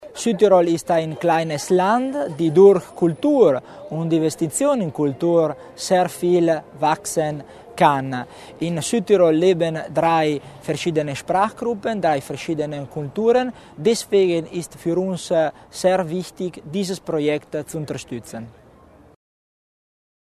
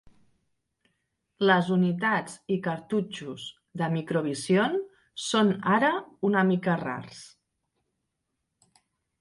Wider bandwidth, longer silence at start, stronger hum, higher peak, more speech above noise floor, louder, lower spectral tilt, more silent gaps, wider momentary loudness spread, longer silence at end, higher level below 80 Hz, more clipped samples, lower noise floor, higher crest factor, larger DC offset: first, 13.5 kHz vs 11.5 kHz; second, 0 s vs 1.4 s; neither; first, -2 dBFS vs -8 dBFS; second, 29 dB vs 55 dB; first, -20 LUFS vs -26 LUFS; about the same, -5.5 dB/octave vs -5.5 dB/octave; neither; about the same, 13 LU vs 15 LU; about the same, 1.9 s vs 1.95 s; first, -58 dBFS vs -70 dBFS; neither; second, -49 dBFS vs -81 dBFS; about the same, 18 dB vs 20 dB; neither